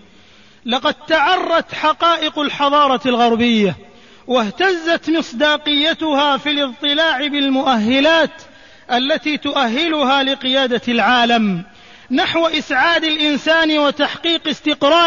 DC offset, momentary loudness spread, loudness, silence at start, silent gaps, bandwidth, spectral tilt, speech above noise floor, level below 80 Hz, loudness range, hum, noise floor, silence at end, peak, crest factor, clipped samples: 0.3%; 5 LU; -15 LUFS; 0.65 s; none; 7.4 kHz; -4 dB/octave; 32 dB; -52 dBFS; 1 LU; none; -47 dBFS; 0 s; -4 dBFS; 12 dB; under 0.1%